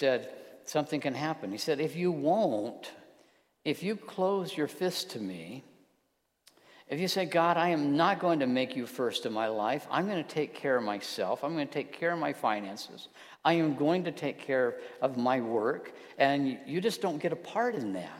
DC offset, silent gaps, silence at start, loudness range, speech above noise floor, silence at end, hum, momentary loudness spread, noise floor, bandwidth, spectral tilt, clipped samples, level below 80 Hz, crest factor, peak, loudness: under 0.1%; none; 0 s; 6 LU; 46 dB; 0 s; none; 12 LU; -77 dBFS; 16 kHz; -5 dB/octave; under 0.1%; -82 dBFS; 20 dB; -10 dBFS; -31 LUFS